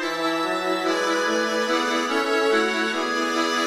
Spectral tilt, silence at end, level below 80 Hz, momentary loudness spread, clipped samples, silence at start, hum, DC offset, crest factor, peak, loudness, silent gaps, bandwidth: -2 dB/octave; 0 s; -70 dBFS; 3 LU; under 0.1%; 0 s; none; under 0.1%; 14 dB; -10 dBFS; -22 LUFS; none; 15.5 kHz